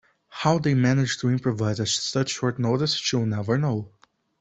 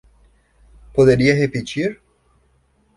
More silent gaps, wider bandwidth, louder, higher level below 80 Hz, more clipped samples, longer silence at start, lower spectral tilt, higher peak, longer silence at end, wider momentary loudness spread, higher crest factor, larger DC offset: neither; second, 8.4 kHz vs 11.5 kHz; second, -24 LUFS vs -17 LUFS; second, -58 dBFS vs -44 dBFS; neither; second, 0.3 s vs 0.95 s; second, -5 dB/octave vs -6.5 dB/octave; second, -6 dBFS vs -2 dBFS; second, 0.5 s vs 1.05 s; second, 6 LU vs 11 LU; about the same, 18 dB vs 18 dB; neither